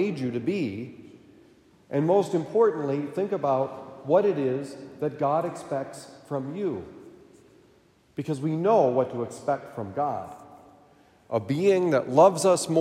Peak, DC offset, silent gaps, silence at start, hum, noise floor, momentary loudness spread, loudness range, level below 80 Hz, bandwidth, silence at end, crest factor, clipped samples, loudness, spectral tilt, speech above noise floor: -6 dBFS; under 0.1%; none; 0 s; none; -60 dBFS; 16 LU; 7 LU; -72 dBFS; 15 kHz; 0 s; 20 dB; under 0.1%; -26 LUFS; -6 dB/octave; 35 dB